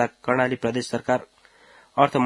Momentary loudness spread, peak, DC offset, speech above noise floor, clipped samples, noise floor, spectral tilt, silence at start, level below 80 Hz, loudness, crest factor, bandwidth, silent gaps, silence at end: 5 LU; -2 dBFS; under 0.1%; 31 dB; under 0.1%; -53 dBFS; -5.5 dB/octave; 0 s; -64 dBFS; -24 LUFS; 22 dB; 12 kHz; none; 0 s